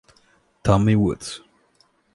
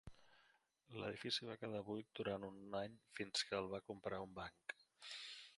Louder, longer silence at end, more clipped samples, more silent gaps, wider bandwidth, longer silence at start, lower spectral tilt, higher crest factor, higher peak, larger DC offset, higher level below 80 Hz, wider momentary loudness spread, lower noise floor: first, -20 LUFS vs -48 LUFS; first, 0.8 s vs 0 s; neither; neither; about the same, 11.5 kHz vs 11.5 kHz; first, 0.65 s vs 0.05 s; first, -7 dB/octave vs -3.5 dB/octave; about the same, 20 dB vs 22 dB; first, -2 dBFS vs -28 dBFS; neither; first, -42 dBFS vs -76 dBFS; first, 17 LU vs 11 LU; second, -62 dBFS vs -77 dBFS